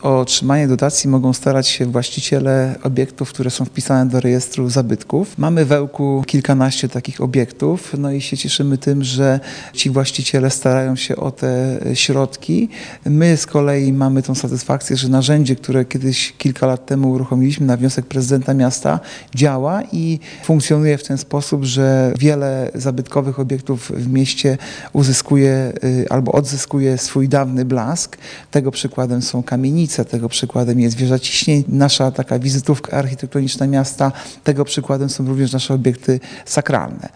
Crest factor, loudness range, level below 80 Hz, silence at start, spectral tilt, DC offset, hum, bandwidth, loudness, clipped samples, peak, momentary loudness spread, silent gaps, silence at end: 16 dB; 2 LU; -52 dBFS; 0 s; -5.5 dB/octave; under 0.1%; none; 10.5 kHz; -16 LUFS; under 0.1%; 0 dBFS; 6 LU; none; 0.1 s